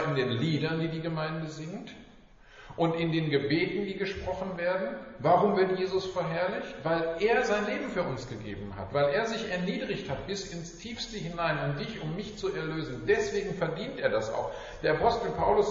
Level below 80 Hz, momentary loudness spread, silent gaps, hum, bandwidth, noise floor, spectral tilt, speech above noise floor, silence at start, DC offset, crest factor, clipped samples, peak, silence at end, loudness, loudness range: -52 dBFS; 11 LU; none; none; 7.4 kHz; -54 dBFS; -4.5 dB/octave; 24 dB; 0 s; under 0.1%; 18 dB; under 0.1%; -10 dBFS; 0 s; -30 LUFS; 5 LU